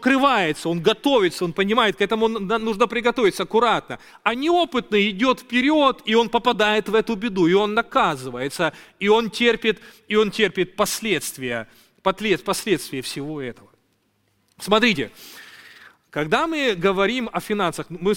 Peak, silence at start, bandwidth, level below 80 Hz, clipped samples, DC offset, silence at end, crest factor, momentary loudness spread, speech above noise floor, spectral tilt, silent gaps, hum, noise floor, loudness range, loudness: -2 dBFS; 0 s; 17 kHz; -52 dBFS; under 0.1%; under 0.1%; 0 s; 18 dB; 10 LU; 46 dB; -4 dB/octave; none; none; -66 dBFS; 6 LU; -21 LUFS